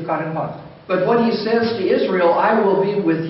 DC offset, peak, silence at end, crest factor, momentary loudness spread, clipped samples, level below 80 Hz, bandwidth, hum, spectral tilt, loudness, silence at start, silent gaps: under 0.1%; -6 dBFS; 0 s; 12 dB; 10 LU; under 0.1%; -60 dBFS; 5.8 kHz; none; -5 dB/octave; -18 LUFS; 0 s; none